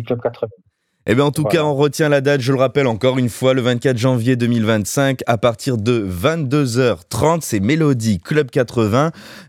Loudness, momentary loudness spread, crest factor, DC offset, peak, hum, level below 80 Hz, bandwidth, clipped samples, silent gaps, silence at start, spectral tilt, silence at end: -17 LUFS; 3 LU; 16 dB; under 0.1%; -2 dBFS; none; -54 dBFS; 16.5 kHz; under 0.1%; none; 0 s; -6 dB/octave; 0.05 s